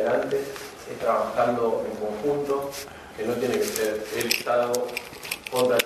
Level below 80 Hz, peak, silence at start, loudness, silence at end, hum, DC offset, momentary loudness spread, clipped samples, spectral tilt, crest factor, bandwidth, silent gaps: -58 dBFS; -2 dBFS; 0 s; -26 LUFS; 0 s; none; under 0.1%; 11 LU; under 0.1%; -3 dB/octave; 22 dB; 14 kHz; none